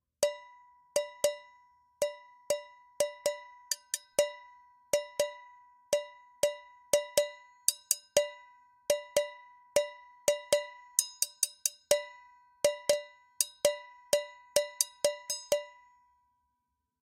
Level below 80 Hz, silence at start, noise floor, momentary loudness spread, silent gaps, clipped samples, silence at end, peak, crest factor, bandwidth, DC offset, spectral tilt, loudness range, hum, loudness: -74 dBFS; 0.2 s; -83 dBFS; 12 LU; none; under 0.1%; 1.35 s; -4 dBFS; 30 dB; 16.5 kHz; under 0.1%; 0 dB/octave; 4 LU; none; -32 LUFS